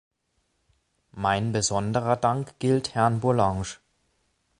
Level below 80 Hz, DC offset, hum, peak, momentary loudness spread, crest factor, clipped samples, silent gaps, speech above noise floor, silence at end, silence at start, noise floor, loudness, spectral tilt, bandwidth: -52 dBFS; under 0.1%; none; -6 dBFS; 7 LU; 20 dB; under 0.1%; none; 49 dB; 0.85 s; 1.15 s; -73 dBFS; -25 LUFS; -5 dB/octave; 11 kHz